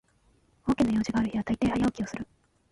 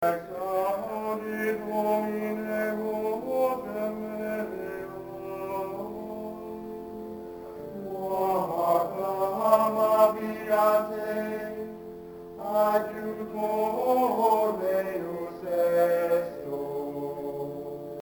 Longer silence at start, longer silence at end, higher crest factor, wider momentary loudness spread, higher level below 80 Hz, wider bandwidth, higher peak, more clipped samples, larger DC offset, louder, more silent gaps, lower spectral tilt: first, 0.65 s vs 0 s; first, 0.45 s vs 0 s; about the same, 16 dB vs 20 dB; second, 11 LU vs 15 LU; first, -50 dBFS vs -64 dBFS; second, 11.5 kHz vs 19 kHz; second, -14 dBFS vs -8 dBFS; neither; neither; about the same, -28 LUFS vs -28 LUFS; neither; about the same, -6.5 dB/octave vs -6 dB/octave